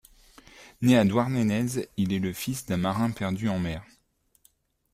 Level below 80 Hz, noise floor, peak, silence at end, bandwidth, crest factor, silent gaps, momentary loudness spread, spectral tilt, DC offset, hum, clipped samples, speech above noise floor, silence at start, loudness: -56 dBFS; -68 dBFS; -8 dBFS; 1.1 s; 15.5 kHz; 20 dB; none; 9 LU; -6 dB/octave; under 0.1%; none; under 0.1%; 43 dB; 0.6 s; -26 LUFS